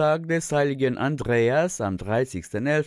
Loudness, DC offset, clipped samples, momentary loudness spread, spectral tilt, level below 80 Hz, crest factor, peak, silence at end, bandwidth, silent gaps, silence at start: -24 LUFS; under 0.1%; under 0.1%; 6 LU; -6 dB/octave; -52 dBFS; 12 dB; -10 dBFS; 0 s; 12 kHz; none; 0 s